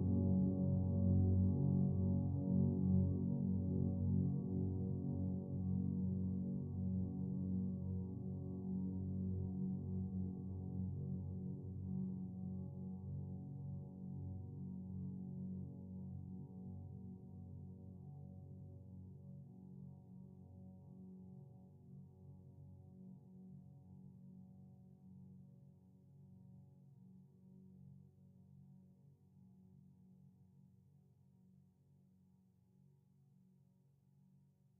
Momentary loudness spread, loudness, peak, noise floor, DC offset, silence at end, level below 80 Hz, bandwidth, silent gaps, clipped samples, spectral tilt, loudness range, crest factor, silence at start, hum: 24 LU; -42 LUFS; -24 dBFS; -72 dBFS; under 0.1%; 4.35 s; -66 dBFS; 1.2 kHz; none; under 0.1%; -12.5 dB/octave; 25 LU; 18 dB; 0 s; none